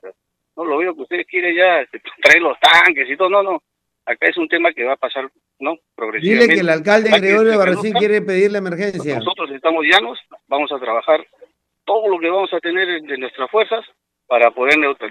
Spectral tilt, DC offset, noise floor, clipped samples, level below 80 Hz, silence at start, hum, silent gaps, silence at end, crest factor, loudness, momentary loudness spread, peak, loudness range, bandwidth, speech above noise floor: -4.5 dB/octave; under 0.1%; -50 dBFS; under 0.1%; -64 dBFS; 0.05 s; none; none; 0 s; 16 dB; -15 LUFS; 14 LU; 0 dBFS; 6 LU; 15.5 kHz; 34 dB